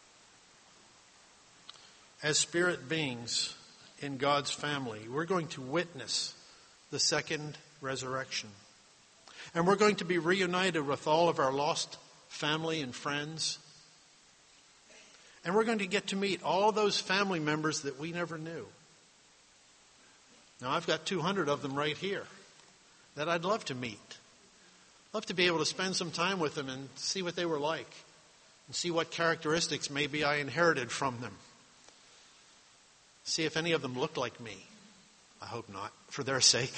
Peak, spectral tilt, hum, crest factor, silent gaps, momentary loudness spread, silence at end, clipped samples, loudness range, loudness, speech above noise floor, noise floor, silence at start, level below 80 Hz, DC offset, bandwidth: -12 dBFS; -3 dB/octave; none; 24 dB; none; 16 LU; 0 s; under 0.1%; 6 LU; -32 LUFS; 30 dB; -63 dBFS; 1.7 s; -72 dBFS; under 0.1%; 8.8 kHz